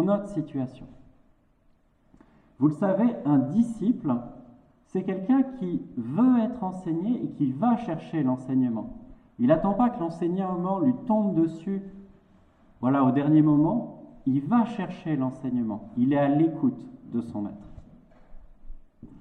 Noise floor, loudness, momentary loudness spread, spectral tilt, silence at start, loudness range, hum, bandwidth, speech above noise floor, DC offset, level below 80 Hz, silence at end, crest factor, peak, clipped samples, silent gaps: -63 dBFS; -26 LUFS; 11 LU; -9.5 dB/octave; 0 s; 3 LU; none; 8.6 kHz; 38 dB; under 0.1%; -54 dBFS; 0 s; 18 dB; -8 dBFS; under 0.1%; none